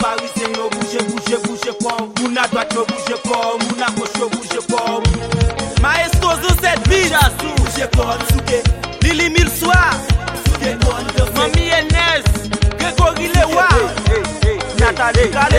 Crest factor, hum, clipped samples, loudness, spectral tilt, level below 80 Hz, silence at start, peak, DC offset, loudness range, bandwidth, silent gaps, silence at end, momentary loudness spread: 14 dB; none; under 0.1%; -16 LUFS; -4.5 dB/octave; -22 dBFS; 0 s; 0 dBFS; under 0.1%; 4 LU; 16.5 kHz; none; 0 s; 7 LU